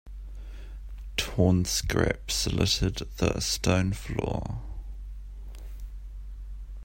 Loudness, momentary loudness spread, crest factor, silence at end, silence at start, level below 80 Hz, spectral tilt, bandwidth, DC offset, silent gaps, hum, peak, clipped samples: -27 LUFS; 19 LU; 22 dB; 0 s; 0.05 s; -38 dBFS; -4.5 dB/octave; 16.5 kHz; under 0.1%; none; none; -8 dBFS; under 0.1%